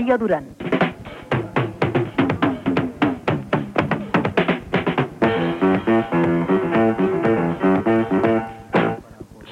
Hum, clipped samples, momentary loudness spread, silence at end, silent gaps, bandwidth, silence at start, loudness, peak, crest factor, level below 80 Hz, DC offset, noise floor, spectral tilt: none; under 0.1%; 6 LU; 0 s; none; 10.5 kHz; 0 s; -20 LUFS; -2 dBFS; 18 dB; -48 dBFS; under 0.1%; -40 dBFS; -8 dB/octave